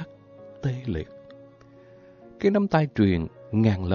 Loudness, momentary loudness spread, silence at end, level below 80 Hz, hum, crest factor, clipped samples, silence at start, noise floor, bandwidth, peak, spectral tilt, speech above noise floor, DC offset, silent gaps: -25 LUFS; 12 LU; 0 s; -44 dBFS; none; 18 dB; under 0.1%; 0 s; -51 dBFS; 7 kHz; -8 dBFS; -9 dB/octave; 28 dB; under 0.1%; none